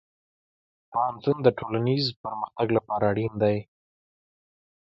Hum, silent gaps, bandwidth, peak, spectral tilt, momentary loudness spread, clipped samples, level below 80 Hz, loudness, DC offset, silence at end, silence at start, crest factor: none; 2.16-2.24 s; 7.6 kHz; -6 dBFS; -8 dB/octave; 9 LU; under 0.1%; -60 dBFS; -26 LUFS; under 0.1%; 1.25 s; 0.9 s; 22 dB